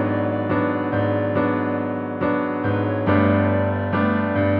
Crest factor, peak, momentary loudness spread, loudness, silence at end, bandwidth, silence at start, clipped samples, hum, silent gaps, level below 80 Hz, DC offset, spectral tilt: 14 dB; -6 dBFS; 5 LU; -21 LUFS; 0 s; 4.9 kHz; 0 s; under 0.1%; none; none; -54 dBFS; under 0.1%; -11 dB/octave